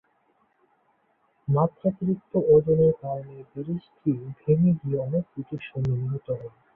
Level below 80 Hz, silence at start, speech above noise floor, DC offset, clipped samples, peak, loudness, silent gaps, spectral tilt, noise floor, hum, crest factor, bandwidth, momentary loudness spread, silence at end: -56 dBFS; 1.5 s; 43 dB; under 0.1%; under 0.1%; -8 dBFS; -25 LUFS; none; -12 dB/octave; -68 dBFS; none; 18 dB; 4.1 kHz; 15 LU; 0.25 s